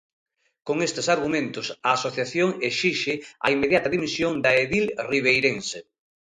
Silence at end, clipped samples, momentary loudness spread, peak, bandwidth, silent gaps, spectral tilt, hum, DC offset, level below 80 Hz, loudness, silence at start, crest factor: 0.5 s; under 0.1%; 9 LU; -4 dBFS; 11 kHz; none; -4 dB/octave; none; under 0.1%; -58 dBFS; -23 LUFS; 0.65 s; 20 dB